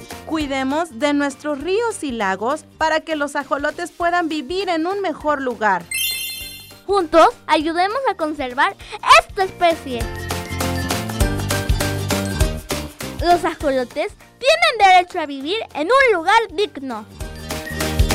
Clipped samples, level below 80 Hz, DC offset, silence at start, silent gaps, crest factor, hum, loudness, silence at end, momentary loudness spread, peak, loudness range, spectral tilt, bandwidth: under 0.1%; -32 dBFS; under 0.1%; 0 s; none; 16 dB; none; -19 LUFS; 0 s; 13 LU; -2 dBFS; 5 LU; -4 dB/octave; 16 kHz